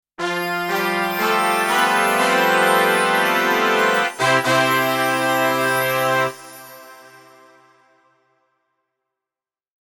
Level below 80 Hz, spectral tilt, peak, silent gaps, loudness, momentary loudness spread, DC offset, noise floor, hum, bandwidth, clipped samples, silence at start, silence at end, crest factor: -64 dBFS; -3 dB/octave; -2 dBFS; none; -17 LUFS; 7 LU; under 0.1%; under -90 dBFS; none; 19 kHz; under 0.1%; 0.2 s; 2.75 s; 18 dB